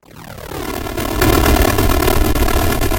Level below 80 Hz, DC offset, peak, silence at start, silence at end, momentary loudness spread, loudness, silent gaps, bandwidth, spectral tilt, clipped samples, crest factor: -20 dBFS; under 0.1%; 0 dBFS; 0.15 s; 0 s; 15 LU; -15 LUFS; none; 17.5 kHz; -5 dB/octave; under 0.1%; 14 dB